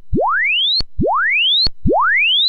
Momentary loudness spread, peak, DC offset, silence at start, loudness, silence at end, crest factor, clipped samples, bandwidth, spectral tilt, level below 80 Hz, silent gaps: 5 LU; -4 dBFS; under 0.1%; 0 s; -14 LUFS; 0 s; 10 dB; under 0.1%; 8 kHz; -5.5 dB/octave; -30 dBFS; none